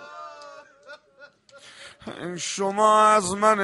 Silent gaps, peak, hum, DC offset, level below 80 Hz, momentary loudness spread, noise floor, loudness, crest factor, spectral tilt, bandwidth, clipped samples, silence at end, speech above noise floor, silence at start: none; -6 dBFS; none; under 0.1%; -64 dBFS; 26 LU; -53 dBFS; -20 LUFS; 18 dB; -3 dB/octave; 11.5 kHz; under 0.1%; 0 s; 32 dB; 0 s